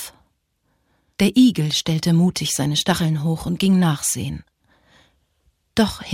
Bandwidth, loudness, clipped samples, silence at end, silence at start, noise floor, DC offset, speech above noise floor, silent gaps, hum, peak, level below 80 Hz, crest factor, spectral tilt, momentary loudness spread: 16.5 kHz; -19 LUFS; under 0.1%; 0 s; 0 s; -68 dBFS; under 0.1%; 50 dB; none; none; -4 dBFS; -48 dBFS; 16 dB; -5 dB/octave; 10 LU